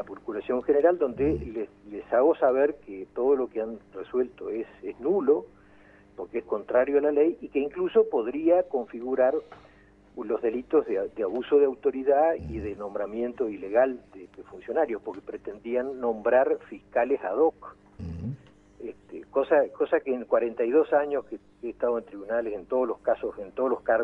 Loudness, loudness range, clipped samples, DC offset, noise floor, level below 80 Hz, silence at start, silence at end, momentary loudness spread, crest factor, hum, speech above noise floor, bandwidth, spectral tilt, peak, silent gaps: -27 LUFS; 3 LU; under 0.1%; under 0.1%; -56 dBFS; -54 dBFS; 0 s; 0 s; 15 LU; 18 dB; 50 Hz at -65 dBFS; 30 dB; 3.9 kHz; -9 dB/octave; -8 dBFS; none